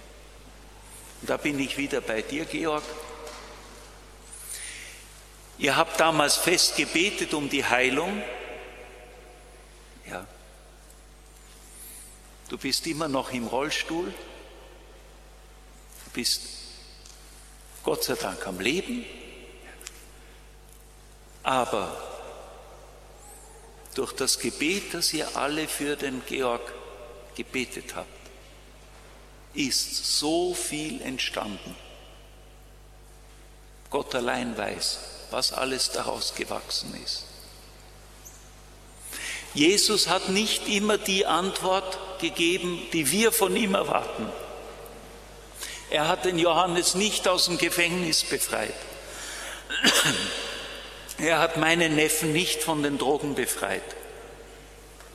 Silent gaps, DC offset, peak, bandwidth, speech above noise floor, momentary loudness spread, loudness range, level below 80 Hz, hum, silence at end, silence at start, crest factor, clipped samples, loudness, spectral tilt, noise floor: none; under 0.1%; -4 dBFS; 15 kHz; 24 dB; 23 LU; 11 LU; -52 dBFS; 50 Hz at -50 dBFS; 0 s; 0 s; 26 dB; under 0.1%; -26 LUFS; -2.5 dB/octave; -50 dBFS